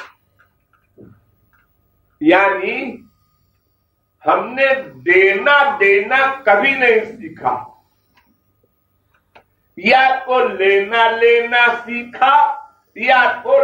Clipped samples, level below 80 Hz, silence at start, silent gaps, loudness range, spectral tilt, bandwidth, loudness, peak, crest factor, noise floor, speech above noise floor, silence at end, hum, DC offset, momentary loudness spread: under 0.1%; -62 dBFS; 0 s; none; 7 LU; -5 dB/octave; 8.2 kHz; -14 LUFS; -2 dBFS; 16 dB; -65 dBFS; 51 dB; 0 s; 50 Hz at -60 dBFS; under 0.1%; 11 LU